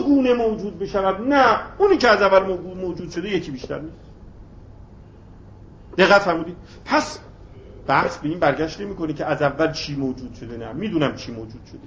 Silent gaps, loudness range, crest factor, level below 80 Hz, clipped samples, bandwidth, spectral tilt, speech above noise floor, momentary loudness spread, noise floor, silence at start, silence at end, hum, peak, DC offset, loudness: none; 6 LU; 20 dB; -46 dBFS; under 0.1%; 8 kHz; -5.5 dB/octave; 23 dB; 19 LU; -43 dBFS; 0 s; 0 s; none; 0 dBFS; under 0.1%; -20 LUFS